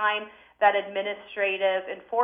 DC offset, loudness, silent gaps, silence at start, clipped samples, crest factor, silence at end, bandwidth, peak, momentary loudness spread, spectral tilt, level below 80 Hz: under 0.1%; -26 LUFS; none; 0 s; under 0.1%; 18 dB; 0 s; 4.8 kHz; -8 dBFS; 9 LU; -5.5 dB/octave; -74 dBFS